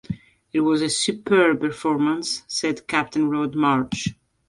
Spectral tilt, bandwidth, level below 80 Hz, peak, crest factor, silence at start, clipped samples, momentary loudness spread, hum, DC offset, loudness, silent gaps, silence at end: -4 dB/octave; 11.5 kHz; -56 dBFS; -4 dBFS; 18 dB; 0.1 s; under 0.1%; 9 LU; none; under 0.1%; -22 LUFS; none; 0.35 s